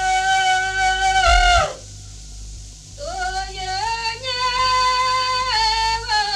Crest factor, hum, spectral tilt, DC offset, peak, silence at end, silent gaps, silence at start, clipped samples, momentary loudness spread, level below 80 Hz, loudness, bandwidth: 18 dB; 50 Hz at -40 dBFS; -1 dB/octave; under 0.1%; -2 dBFS; 0 s; none; 0 s; under 0.1%; 22 LU; -30 dBFS; -18 LUFS; 13 kHz